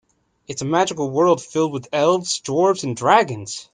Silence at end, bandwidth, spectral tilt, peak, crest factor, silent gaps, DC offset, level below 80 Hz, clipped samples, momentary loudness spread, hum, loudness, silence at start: 0.1 s; 10 kHz; -4.5 dB/octave; -2 dBFS; 18 dB; none; under 0.1%; -64 dBFS; under 0.1%; 8 LU; none; -19 LUFS; 0.5 s